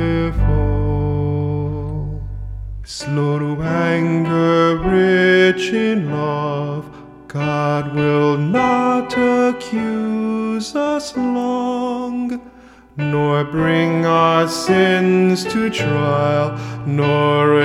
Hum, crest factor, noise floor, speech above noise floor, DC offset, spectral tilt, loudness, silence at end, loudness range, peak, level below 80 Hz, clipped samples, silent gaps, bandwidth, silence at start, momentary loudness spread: none; 14 dB; -43 dBFS; 27 dB; under 0.1%; -6.5 dB/octave; -17 LUFS; 0 s; 5 LU; -2 dBFS; -32 dBFS; under 0.1%; none; 14 kHz; 0 s; 11 LU